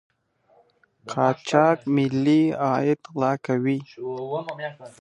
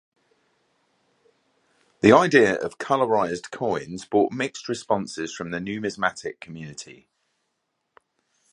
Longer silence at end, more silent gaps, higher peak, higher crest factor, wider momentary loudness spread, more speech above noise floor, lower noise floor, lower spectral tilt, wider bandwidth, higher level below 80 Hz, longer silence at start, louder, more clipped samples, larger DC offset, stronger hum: second, 0.15 s vs 1.6 s; neither; about the same, -2 dBFS vs 0 dBFS; about the same, 22 dB vs 24 dB; second, 13 LU vs 20 LU; second, 39 dB vs 54 dB; second, -62 dBFS vs -77 dBFS; first, -7 dB/octave vs -5 dB/octave; about the same, 10.5 kHz vs 11 kHz; second, -70 dBFS vs -62 dBFS; second, 1.05 s vs 2.05 s; about the same, -23 LUFS vs -23 LUFS; neither; neither; neither